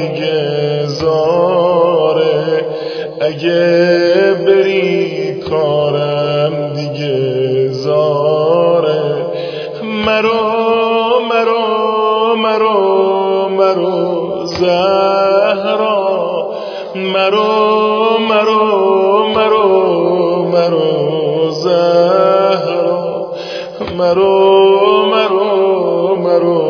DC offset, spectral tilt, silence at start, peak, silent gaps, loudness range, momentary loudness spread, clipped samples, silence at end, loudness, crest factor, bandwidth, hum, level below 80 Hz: under 0.1%; -6.5 dB/octave; 0 s; 0 dBFS; none; 2 LU; 8 LU; under 0.1%; 0 s; -12 LUFS; 12 dB; 5.4 kHz; none; -54 dBFS